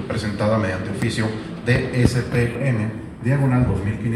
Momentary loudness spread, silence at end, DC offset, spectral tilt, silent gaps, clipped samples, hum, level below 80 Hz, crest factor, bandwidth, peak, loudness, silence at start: 7 LU; 0 s; under 0.1%; -7 dB/octave; none; under 0.1%; none; -38 dBFS; 20 dB; 12.5 kHz; 0 dBFS; -21 LUFS; 0 s